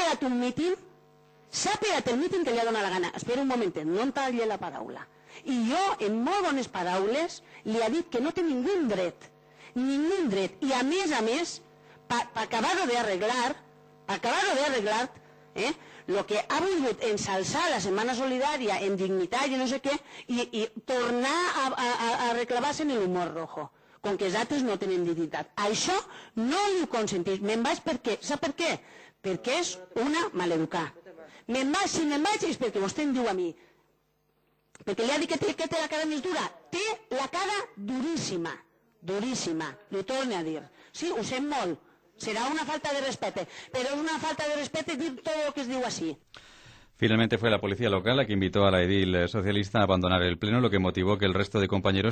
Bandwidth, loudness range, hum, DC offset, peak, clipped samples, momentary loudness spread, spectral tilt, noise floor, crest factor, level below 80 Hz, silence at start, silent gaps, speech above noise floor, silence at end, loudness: 15 kHz; 6 LU; none; under 0.1%; -10 dBFS; under 0.1%; 9 LU; -4.5 dB/octave; -71 dBFS; 20 dB; -54 dBFS; 0 s; none; 43 dB; 0 s; -29 LUFS